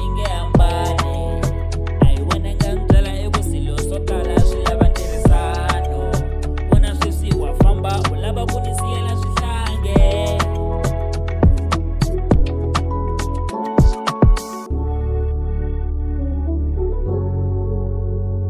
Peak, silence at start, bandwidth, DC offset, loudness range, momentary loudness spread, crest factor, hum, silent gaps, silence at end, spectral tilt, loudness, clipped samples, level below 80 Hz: -2 dBFS; 0 s; 14.5 kHz; under 0.1%; 3 LU; 7 LU; 14 dB; none; none; 0 s; -6.5 dB/octave; -19 LUFS; under 0.1%; -20 dBFS